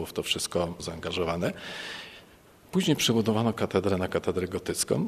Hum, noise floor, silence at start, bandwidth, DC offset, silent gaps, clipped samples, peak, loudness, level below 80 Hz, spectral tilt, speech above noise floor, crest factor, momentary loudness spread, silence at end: none; -55 dBFS; 0 s; 14 kHz; under 0.1%; none; under 0.1%; -10 dBFS; -28 LUFS; -56 dBFS; -4.5 dB/octave; 27 dB; 18 dB; 13 LU; 0 s